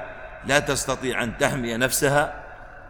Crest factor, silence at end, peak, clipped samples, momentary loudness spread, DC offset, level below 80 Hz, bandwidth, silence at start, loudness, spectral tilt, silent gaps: 20 dB; 0 s; -4 dBFS; under 0.1%; 16 LU; under 0.1%; -44 dBFS; 18 kHz; 0 s; -23 LUFS; -3.5 dB/octave; none